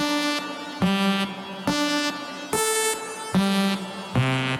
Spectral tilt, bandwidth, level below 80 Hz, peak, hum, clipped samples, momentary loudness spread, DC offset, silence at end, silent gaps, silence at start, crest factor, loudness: -4 dB/octave; 17 kHz; -54 dBFS; -10 dBFS; none; under 0.1%; 8 LU; under 0.1%; 0 s; none; 0 s; 14 dB; -24 LUFS